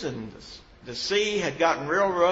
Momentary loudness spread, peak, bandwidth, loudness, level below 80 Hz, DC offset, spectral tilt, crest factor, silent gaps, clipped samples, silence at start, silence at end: 21 LU; -8 dBFS; 8 kHz; -25 LUFS; -56 dBFS; under 0.1%; -3.5 dB/octave; 18 dB; none; under 0.1%; 0 s; 0 s